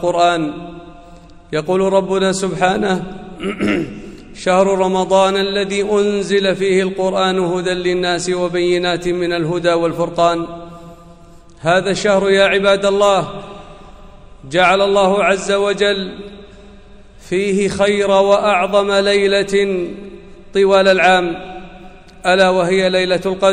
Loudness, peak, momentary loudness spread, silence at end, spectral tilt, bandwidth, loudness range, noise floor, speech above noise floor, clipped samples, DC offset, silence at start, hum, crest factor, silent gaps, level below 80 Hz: -15 LUFS; -2 dBFS; 14 LU; 0 s; -4.5 dB/octave; 11 kHz; 3 LU; -41 dBFS; 26 dB; under 0.1%; under 0.1%; 0 s; none; 14 dB; none; -44 dBFS